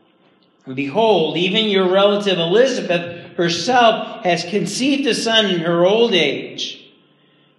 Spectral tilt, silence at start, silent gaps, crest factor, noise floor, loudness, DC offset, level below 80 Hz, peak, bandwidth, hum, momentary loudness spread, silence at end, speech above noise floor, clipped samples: -4 dB/octave; 0.65 s; none; 18 dB; -56 dBFS; -16 LUFS; under 0.1%; -72 dBFS; 0 dBFS; 12.5 kHz; none; 10 LU; 0.8 s; 39 dB; under 0.1%